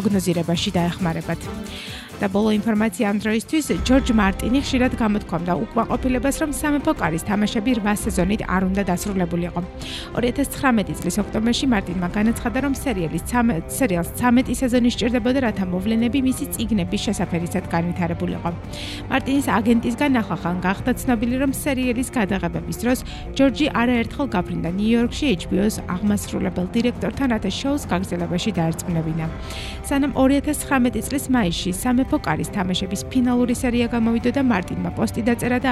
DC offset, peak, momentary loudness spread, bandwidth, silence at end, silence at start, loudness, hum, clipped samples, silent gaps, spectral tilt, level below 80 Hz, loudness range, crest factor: under 0.1%; -4 dBFS; 6 LU; 15 kHz; 0 s; 0 s; -21 LUFS; none; under 0.1%; none; -5.5 dB/octave; -36 dBFS; 2 LU; 16 dB